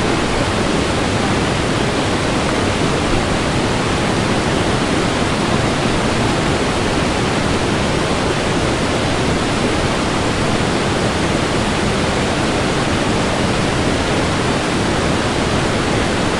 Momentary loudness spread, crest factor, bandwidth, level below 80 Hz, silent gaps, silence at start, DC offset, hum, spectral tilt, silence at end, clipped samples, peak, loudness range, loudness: 1 LU; 14 dB; 11.5 kHz; -30 dBFS; none; 0 s; under 0.1%; none; -4.5 dB/octave; 0 s; under 0.1%; -2 dBFS; 0 LU; -17 LUFS